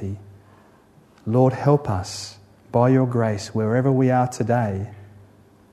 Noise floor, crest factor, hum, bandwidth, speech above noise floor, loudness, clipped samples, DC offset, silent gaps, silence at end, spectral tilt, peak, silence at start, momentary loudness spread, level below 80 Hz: -53 dBFS; 16 dB; none; 12 kHz; 33 dB; -21 LUFS; under 0.1%; under 0.1%; none; 0.65 s; -7.5 dB/octave; -6 dBFS; 0 s; 15 LU; -58 dBFS